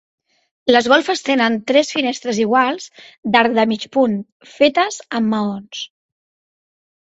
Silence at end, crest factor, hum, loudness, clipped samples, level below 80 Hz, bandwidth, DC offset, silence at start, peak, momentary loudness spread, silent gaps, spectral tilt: 1.35 s; 18 dB; none; -17 LUFS; under 0.1%; -62 dBFS; 8 kHz; under 0.1%; 0.65 s; 0 dBFS; 14 LU; 3.18-3.23 s, 4.32-4.40 s; -4 dB/octave